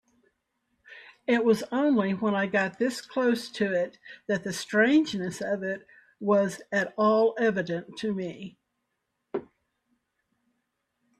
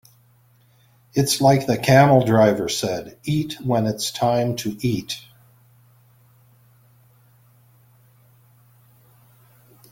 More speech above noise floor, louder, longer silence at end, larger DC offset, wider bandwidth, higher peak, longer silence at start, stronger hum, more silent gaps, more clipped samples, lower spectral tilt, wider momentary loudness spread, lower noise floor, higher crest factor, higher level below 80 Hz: first, 54 dB vs 38 dB; second, -27 LUFS vs -19 LUFS; second, 1.75 s vs 4.75 s; neither; second, 13.5 kHz vs 17 kHz; second, -10 dBFS vs -2 dBFS; second, 0.9 s vs 1.15 s; neither; neither; neither; about the same, -5.5 dB/octave vs -5.5 dB/octave; first, 15 LU vs 12 LU; first, -80 dBFS vs -57 dBFS; about the same, 18 dB vs 20 dB; second, -72 dBFS vs -56 dBFS